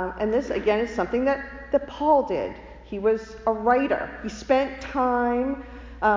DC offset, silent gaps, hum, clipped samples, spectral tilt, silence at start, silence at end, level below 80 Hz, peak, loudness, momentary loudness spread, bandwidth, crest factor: under 0.1%; none; none; under 0.1%; -6 dB/octave; 0 s; 0 s; -46 dBFS; -8 dBFS; -24 LUFS; 12 LU; 7.6 kHz; 16 dB